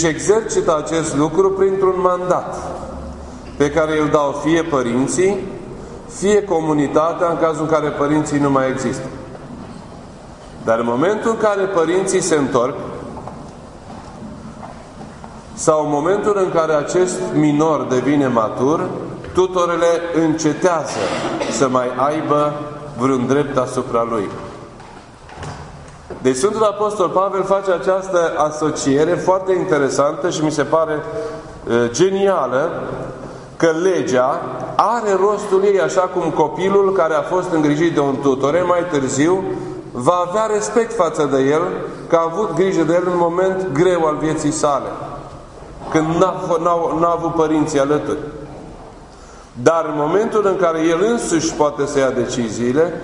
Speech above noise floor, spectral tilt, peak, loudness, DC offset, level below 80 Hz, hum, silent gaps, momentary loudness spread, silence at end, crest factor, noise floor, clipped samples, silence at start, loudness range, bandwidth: 23 dB; -5.5 dB/octave; 0 dBFS; -17 LUFS; under 0.1%; -46 dBFS; none; none; 18 LU; 0 s; 18 dB; -39 dBFS; under 0.1%; 0 s; 4 LU; 11 kHz